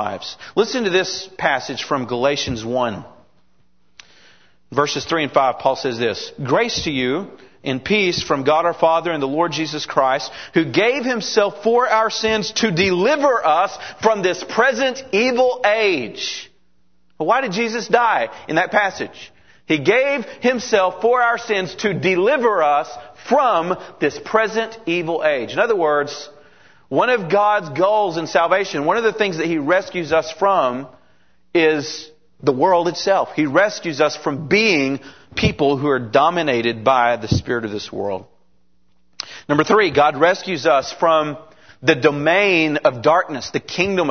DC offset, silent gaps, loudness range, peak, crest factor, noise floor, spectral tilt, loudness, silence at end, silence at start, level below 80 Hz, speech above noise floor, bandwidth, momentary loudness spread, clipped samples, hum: 0.3%; none; 4 LU; 0 dBFS; 18 dB; -64 dBFS; -4.5 dB/octave; -18 LUFS; 0 s; 0 s; -52 dBFS; 47 dB; 6.6 kHz; 9 LU; under 0.1%; none